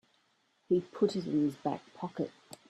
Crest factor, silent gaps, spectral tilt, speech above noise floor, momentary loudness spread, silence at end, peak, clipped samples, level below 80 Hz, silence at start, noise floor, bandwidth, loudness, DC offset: 18 dB; none; -7.5 dB/octave; 41 dB; 10 LU; 0.15 s; -16 dBFS; under 0.1%; -74 dBFS; 0.7 s; -73 dBFS; 12.5 kHz; -34 LUFS; under 0.1%